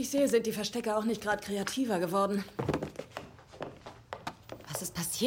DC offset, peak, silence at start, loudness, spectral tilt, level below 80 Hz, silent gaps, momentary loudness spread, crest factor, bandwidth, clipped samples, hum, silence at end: under 0.1%; -14 dBFS; 0 s; -32 LUFS; -4 dB/octave; -62 dBFS; none; 17 LU; 18 dB; 17 kHz; under 0.1%; none; 0 s